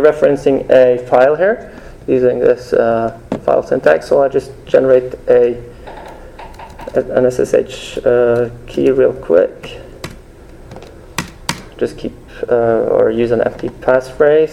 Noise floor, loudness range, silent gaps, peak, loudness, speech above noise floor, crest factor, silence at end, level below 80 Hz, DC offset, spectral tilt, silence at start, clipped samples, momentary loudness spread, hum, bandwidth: -36 dBFS; 5 LU; none; 0 dBFS; -14 LUFS; 24 dB; 14 dB; 0 s; -40 dBFS; under 0.1%; -6 dB/octave; 0 s; under 0.1%; 20 LU; none; 12.5 kHz